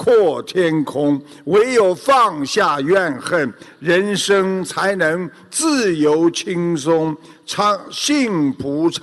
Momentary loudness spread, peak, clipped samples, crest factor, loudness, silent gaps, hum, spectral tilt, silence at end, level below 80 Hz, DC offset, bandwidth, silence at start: 6 LU; -4 dBFS; under 0.1%; 12 dB; -17 LUFS; none; none; -4.5 dB/octave; 0.05 s; -60 dBFS; under 0.1%; 12.5 kHz; 0 s